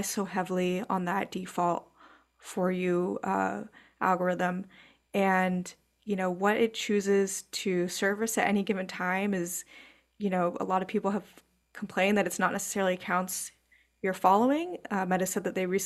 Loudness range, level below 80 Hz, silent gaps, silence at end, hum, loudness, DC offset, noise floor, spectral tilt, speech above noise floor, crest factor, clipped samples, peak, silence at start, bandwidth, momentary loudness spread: 3 LU; -70 dBFS; none; 0 s; none; -29 LUFS; under 0.1%; -59 dBFS; -4.5 dB/octave; 30 dB; 20 dB; under 0.1%; -10 dBFS; 0 s; 14.5 kHz; 10 LU